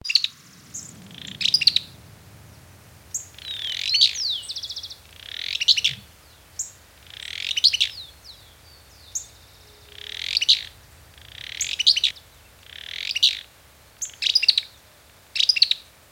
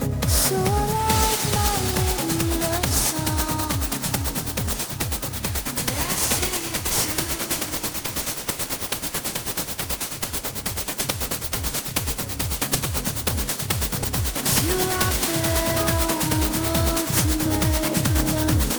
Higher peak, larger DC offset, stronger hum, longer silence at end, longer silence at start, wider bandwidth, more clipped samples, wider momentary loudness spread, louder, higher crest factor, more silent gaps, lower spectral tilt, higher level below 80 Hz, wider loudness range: first, -2 dBFS vs -6 dBFS; neither; neither; first, 0.3 s vs 0 s; about the same, 0.05 s vs 0 s; about the same, 19.5 kHz vs over 20 kHz; neither; first, 22 LU vs 6 LU; first, -20 LUFS vs -23 LUFS; first, 24 dB vs 18 dB; neither; second, 1.5 dB/octave vs -3.5 dB/octave; second, -58 dBFS vs -32 dBFS; about the same, 4 LU vs 4 LU